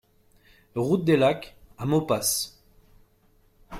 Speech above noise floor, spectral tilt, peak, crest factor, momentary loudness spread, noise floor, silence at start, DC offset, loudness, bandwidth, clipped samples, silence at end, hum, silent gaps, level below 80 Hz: 38 dB; -4.5 dB/octave; -8 dBFS; 18 dB; 14 LU; -62 dBFS; 0.75 s; under 0.1%; -25 LUFS; 16.5 kHz; under 0.1%; 0 s; none; none; -58 dBFS